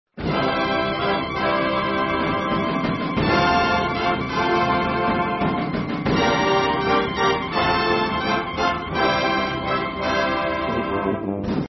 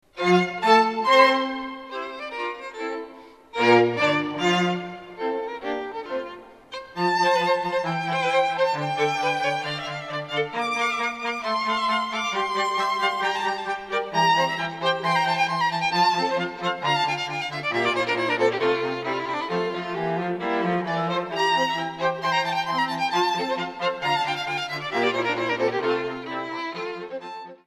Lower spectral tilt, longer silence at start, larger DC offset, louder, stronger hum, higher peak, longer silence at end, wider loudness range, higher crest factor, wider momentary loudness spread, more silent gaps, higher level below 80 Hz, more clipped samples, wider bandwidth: first, -6 dB/octave vs -4.5 dB/octave; about the same, 0.15 s vs 0.15 s; neither; first, -21 LUFS vs -24 LUFS; neither; second, -6 dBFS vs -2 dBFS; about the same, 0 s vs 0.1 s; about the same, 2 LU vs 3 LU; second, 14 dB vs 22 dB; second, 5 LU vs 12 LU; neither; first, -42 dBFS vs -66 dBFS; neither; second, 6.2 kHz vs 13.5 kHz